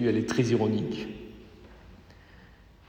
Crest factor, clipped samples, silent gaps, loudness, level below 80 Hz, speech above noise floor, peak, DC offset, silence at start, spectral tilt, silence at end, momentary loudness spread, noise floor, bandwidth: 20 dB; under 0.1%; none; -28 LUFS; -56 dBFS; 27 dB; -10 dBFS; under 0.1%; 0 s; -6.5 dB/octave; 0.75 s; 24 LU; -54 dBFS; 10 kHz